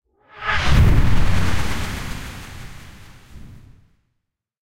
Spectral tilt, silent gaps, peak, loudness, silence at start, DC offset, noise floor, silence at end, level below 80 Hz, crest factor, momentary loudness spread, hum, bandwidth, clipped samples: -5.5 dB/octave; none; -4 dBFS; -21 LUFS; 0 s; under 0.1%; -76 dBFS; 0 s; -24 dBFS; 16 dB; 24 LU; none; 16 kHz; under 0.1%